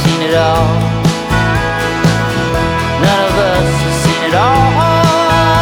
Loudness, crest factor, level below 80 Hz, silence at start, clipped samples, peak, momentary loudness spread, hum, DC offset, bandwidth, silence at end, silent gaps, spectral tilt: -12 LUFS; 10 dB; -26 dBFS; 0 s; under 0.1%; 0 dBFS; 4 LU; none; under 0.1%; 18.5 kHz; 0 s; none; -5.5 dB/octave